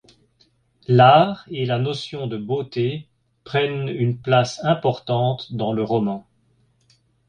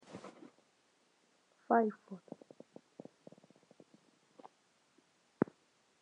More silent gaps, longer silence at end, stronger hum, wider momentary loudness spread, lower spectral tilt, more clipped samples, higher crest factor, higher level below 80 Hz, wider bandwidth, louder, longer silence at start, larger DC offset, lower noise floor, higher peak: neither; first, 1.1 s vs 0.6 s; neither; second, 13 LU vs 29 LU; about the same, -7 dB/octave vs -7.5 dB/octave; neither; second, 20 dB vs 28 dB; first, -58 dBFS vs -88 dBFS; about the same, 9.2 kHz vs 10 kHz; first, -20 LUFS vs -35 LUFS; first, 0.9 s vs 0.1 s; neither; second, -62 dBFS vs -74 dBFS; first, -2 dBFS vs -16 dBFS